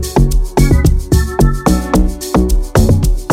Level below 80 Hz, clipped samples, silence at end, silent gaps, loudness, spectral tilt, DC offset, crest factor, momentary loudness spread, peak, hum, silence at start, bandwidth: -14 dBFS; under 0.1%; 0 s; none; -13 LUFS; -6.5 dB/octave; under 0.1%; 10 dB; 4 LU; 0 dBFS; none; 0 s; 16 kHz